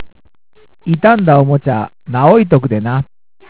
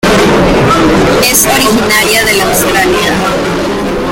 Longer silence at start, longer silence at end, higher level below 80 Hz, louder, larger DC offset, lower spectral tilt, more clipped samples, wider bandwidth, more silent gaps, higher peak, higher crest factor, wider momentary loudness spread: about the same, 0 s vs 0.05 s; first, 0.45 s vs 0 s; second, -46 dBFS vs -26 dBFS; second, -12 LUFS vs -8 LUFS; first, 0.6% vs under 0.1%; first, -12 dB/octave vs -3.5 dB/octave; first, 0.3% vs 0.1%; second, 4 kHz vs over 20 kHz; neither; about the same, 0 dBFS vs 0 dBFS; about the same, 12 dB vs 8 dB; first, 11 LU vs 6 LU